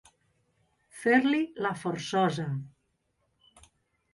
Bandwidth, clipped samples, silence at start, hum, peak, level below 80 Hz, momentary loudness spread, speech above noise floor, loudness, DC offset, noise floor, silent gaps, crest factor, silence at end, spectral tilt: 11.5 kHz; under 0.1%; 0.95 s; none; -10 dBFS; -70 dBFS; 11 LU; 48 dB; -28 LUFS; under 0.1%; -76 dBFS; none; 22 dB; 1.45 s; -6 dB/octave